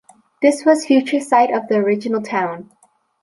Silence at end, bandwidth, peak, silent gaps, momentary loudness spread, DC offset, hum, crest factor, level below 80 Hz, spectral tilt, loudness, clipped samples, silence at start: 0.6 s; 11.5 kHz; -2 dBFS; none; 8 LU; under 0.1%; none; 16 dB; -68 dBFS; -5 dB/octave; -17 LUFS; under 0.1%; 0.4 s